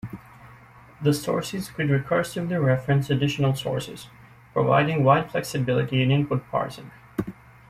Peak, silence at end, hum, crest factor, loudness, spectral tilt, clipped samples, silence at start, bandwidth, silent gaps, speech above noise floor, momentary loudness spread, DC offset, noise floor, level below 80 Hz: -2 dBFS; 0.4 s; none; 22 dB; -24 LUFS; -6.5 dB/octave; under 0.1%; 0.05 s; 15 kHz; none; 26 dB; 14 LU; under 0.1%; -49 dBFS; -54 dBFS